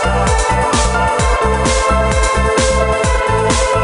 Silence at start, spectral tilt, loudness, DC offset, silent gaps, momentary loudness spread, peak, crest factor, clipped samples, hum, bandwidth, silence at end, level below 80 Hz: 0 s; -4 dB/octave; -14 LUFS; under 0.1%; none; 1 LU; 0 dBFS; 12 dB; under 0.1%; none; 11 kHz; 0 s; -18 dBFS